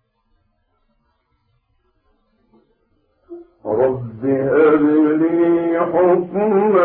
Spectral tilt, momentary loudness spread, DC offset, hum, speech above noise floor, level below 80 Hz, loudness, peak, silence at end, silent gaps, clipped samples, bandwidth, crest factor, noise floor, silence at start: -12.5 dB/octave; 8 LU; under 0.1%; none; 50 dB; -58 dBFS; -16 LUFS; -4 dBFS; 0 s; none; under 0.1%; 3.8 kHz; 14 dB; -65 dBFS; 3.3 s